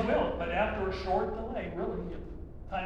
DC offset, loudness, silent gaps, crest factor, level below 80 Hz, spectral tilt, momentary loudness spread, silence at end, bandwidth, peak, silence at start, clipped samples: under 0.1%; -33 LUFS; none; 18 dB; -44 dBFS; -7.5 dB/octave; 13 LU; 0 s; 8.6 kHz; -16 dBFS; 0 s; under 0.1%